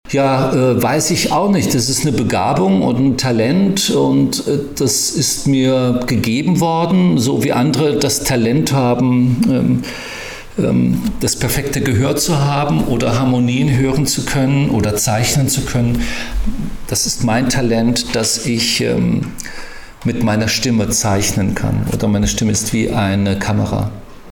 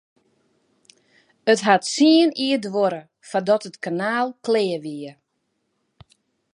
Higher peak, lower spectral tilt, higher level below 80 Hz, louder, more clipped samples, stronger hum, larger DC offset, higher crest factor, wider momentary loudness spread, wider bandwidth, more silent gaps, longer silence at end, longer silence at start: second, -6 dBFS vs -2 dBFS; about the same, -5 dB/octave vs -4 dB/octave; first, -32 dBFS vs -72 dBFS; first, -15 LUFS vs -20 LUFS; neither; neither; neither; second, 8 dB vs 20 dB; second, 6 LU vs 14 LU; first, 19 kHz vs 11 kHz; neither; second, 0 s vs 1.45 s; second, 0.05 s vs 1.45 s